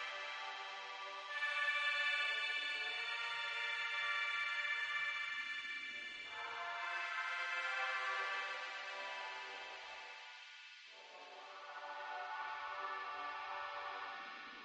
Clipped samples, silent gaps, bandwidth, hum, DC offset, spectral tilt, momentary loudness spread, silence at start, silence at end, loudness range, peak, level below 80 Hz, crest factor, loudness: under 0.1%; none; 10.5 kHz; none; under 0.1%; 1 dB/octave; 15 LU; 0 s; 0 s; 11 LU; -26 dBFS; under -90 dBFS; 18 dB; -41 LUFS